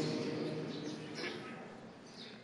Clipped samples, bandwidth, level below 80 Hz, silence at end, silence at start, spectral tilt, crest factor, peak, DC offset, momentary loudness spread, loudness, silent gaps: under 0.1%; 11.5 kHz; -80 dBFS; 0 s; 0 s; -5.5 dB/octave; 16 dB; -26 dBFS; under 0.1%; 13 LU; -43 LUFS; none